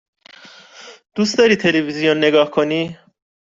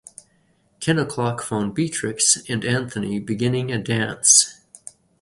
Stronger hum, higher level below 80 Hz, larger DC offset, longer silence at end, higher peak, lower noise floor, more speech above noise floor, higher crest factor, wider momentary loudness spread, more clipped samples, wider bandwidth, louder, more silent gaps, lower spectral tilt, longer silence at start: neither; about the same, -60 dBFS vs -56 dBFS; neither; second, 0.55 s vs 0.7 s; about the same, -2 dBFS vs -2 dBFS; second, -43 dBFS vs -62 dBFS; second, 27 dB vs 41 dB; second, 16 dB vs 22 dB; second, 9 LU vs 13 LU; neither; second, 7.8 kHz vs 11.5 kHz; first, -16 LUFS vs -20 LUFS; neither; first, -4.5 dB/octave vs -3 dB/octave; about the same, 0.75 s vs 0.8 s